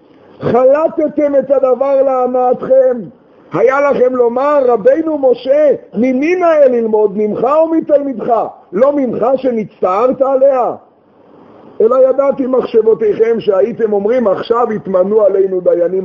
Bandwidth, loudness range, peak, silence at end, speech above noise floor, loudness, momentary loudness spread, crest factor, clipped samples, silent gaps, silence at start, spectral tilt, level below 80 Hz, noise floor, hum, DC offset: 6.2 kHz; 2 LU; 0 dBFS; 0 s; 34 dB; -12 LUFS; 5 LU; 12 dB; under 0.1%; none; 0.4 s; -8 dB/octave; -56 dBFS; -45 dBFS; none; under 0.1%